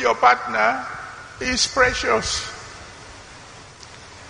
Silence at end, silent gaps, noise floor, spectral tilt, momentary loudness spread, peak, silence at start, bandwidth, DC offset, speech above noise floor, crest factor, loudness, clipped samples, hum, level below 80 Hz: 0 s; none; -42 dBFS; -2 dB/octave; 24 LU; -2 dBFS; 0 s; 10 kHz; under 0.1%; 22 dB; 22 dB; -19 LUFS; under 0.1%; none; -44 dBFS